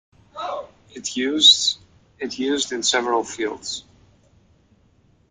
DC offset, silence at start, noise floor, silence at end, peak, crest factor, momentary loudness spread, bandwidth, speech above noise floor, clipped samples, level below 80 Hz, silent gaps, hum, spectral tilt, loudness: under 0.1%; 0.35 s; -58 dBFS; 1.5 s; -2 dBFS; 22 dB; 21 LU; 13 kHz; 38 dB; under 0.1%; -62 dBFS; none; none; -0.5 dB/octave; -19 LUFS